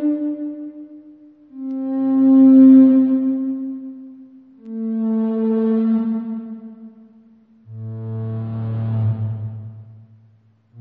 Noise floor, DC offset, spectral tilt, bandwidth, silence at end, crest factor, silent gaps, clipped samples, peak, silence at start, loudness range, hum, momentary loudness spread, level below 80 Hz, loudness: -54 dBFS; under 0.1%; -11.5 dB/octave; 2.5 kHz; 0 s; 16 dB; none; under 0.1%; -2 dBFS; 0 s; 12 LU; none; 25 LU; -62 dBFS; -17 LUFS